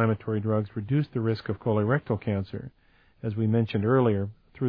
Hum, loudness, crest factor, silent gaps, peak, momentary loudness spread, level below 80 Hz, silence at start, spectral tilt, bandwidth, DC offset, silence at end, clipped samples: none; -27 LUFS; 16 dB; none; -10 dBFS; 13 LU; -60 dBFS; 0 s; -11 dB/octave; 5 kHz; under 0.1%; 0 s; under 0.1%